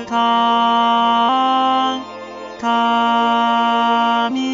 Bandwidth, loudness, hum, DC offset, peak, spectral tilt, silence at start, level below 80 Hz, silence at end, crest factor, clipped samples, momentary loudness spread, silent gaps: 7.6 kHz; -15 LUFS; none; under 0.1%; -6 dBFS; -4 dB/octave; 0 s; -68 dBFS; 0 s; 10 dB; under 0.1%; 9 LU; none